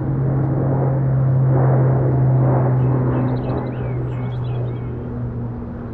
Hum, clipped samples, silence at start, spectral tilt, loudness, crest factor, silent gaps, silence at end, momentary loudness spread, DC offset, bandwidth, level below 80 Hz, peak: none; under 0.1%; 0 s; -12.5 dB/octave; -19 LUFS; 12 dB; none; 0 s; 11 LU; under 0.1%; 3.5 kHz; -36 dBFS; -6 dBFS